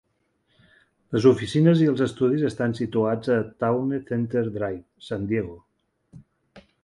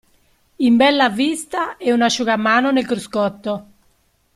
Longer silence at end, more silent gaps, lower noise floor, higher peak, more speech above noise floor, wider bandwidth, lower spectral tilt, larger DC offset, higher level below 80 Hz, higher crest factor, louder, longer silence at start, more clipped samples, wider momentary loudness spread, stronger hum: second, 0.25 s vs 0.75 s; neither; first, -70 dBFS vs -60 dBFS; about the same, -4 dBFS vs -2 dBFS; first, 48 dB vs 43 dB; second, 11 kHz vs 12.5 kHz; first, -8 dB/octave vs -4 dB/octave; neither; about the same, -56 dBFS vs -58 dBFS; about the same, 20 dB vs 16 dB; second, -23 LUFS vs -17 LUFS; first, 1.1 s vs 0.6 s; neither; about the same, 11 LU vs 10 LU; neither